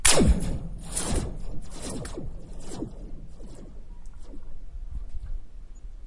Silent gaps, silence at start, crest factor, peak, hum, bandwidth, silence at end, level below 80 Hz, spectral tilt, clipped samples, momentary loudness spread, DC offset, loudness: none; 0 s; 24 dB; -4 dBFS; none; 11.5 kHz; 0 s; -34 dBFS; -3.5 dB/octave; under 0.1%; 20 LU; under 0.1%; -30 LUFS